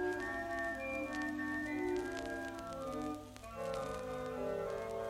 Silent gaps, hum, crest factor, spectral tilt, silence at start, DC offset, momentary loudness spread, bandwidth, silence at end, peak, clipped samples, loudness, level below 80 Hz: none; none; 16 dB; -5 dB/octave; 0 s; under 0.1%; 6 LU; 16 kHz; 0 s; -24 dBFS; under 0.1%; -41 LUFS; -60 dBFS